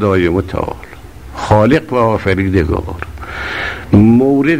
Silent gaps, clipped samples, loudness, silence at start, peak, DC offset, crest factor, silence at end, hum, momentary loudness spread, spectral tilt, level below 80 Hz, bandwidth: none; under 0.1%; -13 LUFS; 0 s; 0 dBFS; 0.8%; 12 dB; 0 s; none; 16 LU; -8 dB/octave; -30 dBFS; 15.5 kHz